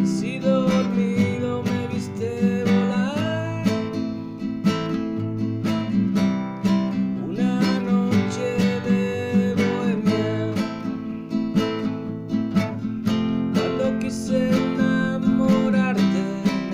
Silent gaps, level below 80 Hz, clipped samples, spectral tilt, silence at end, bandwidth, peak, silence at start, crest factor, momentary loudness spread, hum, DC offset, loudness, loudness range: none; -54 dBFS; under 0.1%; -7 dB/octave; 0 s; 15 kHz; -8 dBFS; 0 s; 14 dB; 7 LU; none; under 0.1%; -23 LUFS; 3 LU